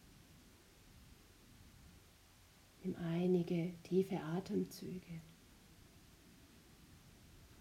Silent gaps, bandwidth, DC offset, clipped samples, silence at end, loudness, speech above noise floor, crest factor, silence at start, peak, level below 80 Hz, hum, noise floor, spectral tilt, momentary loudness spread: none; 16 kHz; under 0.1%; under 0.1%; 0 s; -40 LUFS; 25 dB; 20 dB; 0.15 s; -24 dBFS; -70 dBFS; none; -65 dBFS; -7.5 dB/octave; 26 LU